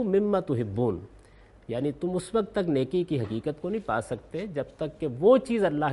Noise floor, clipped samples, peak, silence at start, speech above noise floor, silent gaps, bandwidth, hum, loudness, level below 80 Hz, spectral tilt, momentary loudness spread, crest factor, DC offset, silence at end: -54 dBFS; under 0.1%; -8 dBFS; 0 s; 27 dB; none; 11.5 kHz; none; -28 LUFS; -56 dBFS; -7.5 dB/octave; 12 LU; 18 dB; under 0.1%; 0 s